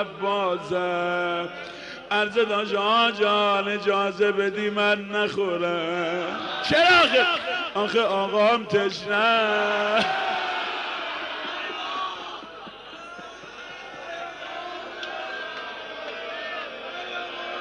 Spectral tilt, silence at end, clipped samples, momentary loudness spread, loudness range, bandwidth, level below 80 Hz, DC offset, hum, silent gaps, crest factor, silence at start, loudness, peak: -4 dB/octave; 0 s; under 0.1%; 16 LU; 13 LU; 11.5 kHz; -64 dBFS; under 0.1%; none; none; 16 dB; 0 s; -24 LUFS; -8 dBFS